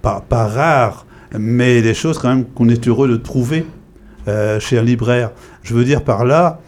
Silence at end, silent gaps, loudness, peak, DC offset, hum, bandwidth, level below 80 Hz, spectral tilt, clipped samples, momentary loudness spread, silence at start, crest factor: 0.1 s; none; -15 LUFS; -2 dBFS; under 0.1%; none; 12.5 kHz; -36 dBFS; -7 dB/octave; under 0.1%; 9 LU; 0.05 s; 14 dB